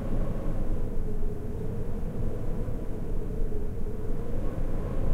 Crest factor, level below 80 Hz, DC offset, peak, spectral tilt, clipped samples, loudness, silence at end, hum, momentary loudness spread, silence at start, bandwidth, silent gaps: 12 dB; -28 dBFS; under 0.1%; -14 dBFS; -9 dB/octave; under 0.1%; -35 LUFS; 0 s; none; 2 LU; 0 s; 3 kHz; none